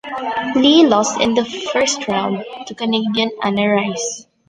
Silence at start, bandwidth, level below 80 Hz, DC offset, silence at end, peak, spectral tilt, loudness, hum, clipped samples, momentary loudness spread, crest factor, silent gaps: 0.05 s; 10 kHz; -56 dBFS; under 0.1%; 0.25 s; -2 dBFS; -3.5 dB/octave; -17 LUFS; none; under 0.1%; 12 LU; 16 dB; none